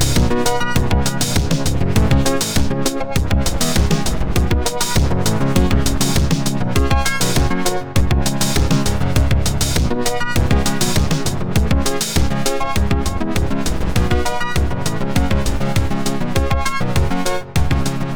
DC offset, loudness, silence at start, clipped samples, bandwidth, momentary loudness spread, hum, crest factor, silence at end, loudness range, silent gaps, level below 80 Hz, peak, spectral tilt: under 0.1%; -18 LUFS; 0 s; under 0.1%; over 20 kHz; 4 LU; none; 12 dB; 0 s; 2 LU; none; -22 dBFS; -2 dBFS; -4.5 dB/octave